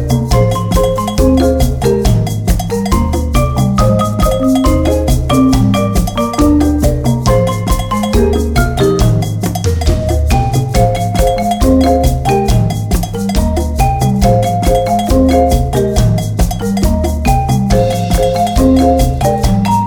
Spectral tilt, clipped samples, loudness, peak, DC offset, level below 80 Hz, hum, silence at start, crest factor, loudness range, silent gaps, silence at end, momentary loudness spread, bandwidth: -6.5 dB/octave; under 0.1%; -12 LUFS; 0 dBFS; under 0.1%; -16 dBFS; none; 0 s; 10 dB; 1 LU; none; 0 s; 5 LU; 20 kHz